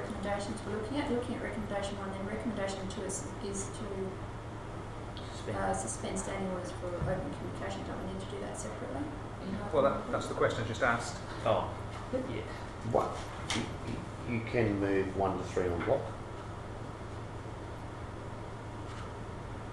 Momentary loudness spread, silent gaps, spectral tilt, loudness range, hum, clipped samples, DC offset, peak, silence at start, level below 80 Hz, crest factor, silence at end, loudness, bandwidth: 12 LU; none; -5.5 dB/octave; 6 LU; none; under 0.1%; under 0.1%; -14 dBFS; 0 s; -50 dBFS; 22 dB; 0 s; -36 LUFS; 12 kHz